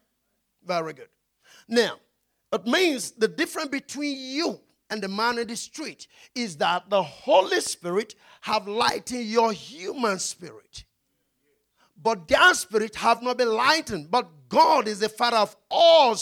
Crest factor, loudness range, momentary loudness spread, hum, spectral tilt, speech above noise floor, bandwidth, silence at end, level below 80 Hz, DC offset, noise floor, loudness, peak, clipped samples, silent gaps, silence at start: 18 dB; 7 LU; 16 LU; none; -2.5 dB/octave; 51 dB; 17 kHz; 0 s; -62 dBFS; under 0.1%; -75 dBFS; -23 LUFS; -6 dBFS; under 0.1%; none; 0.65 s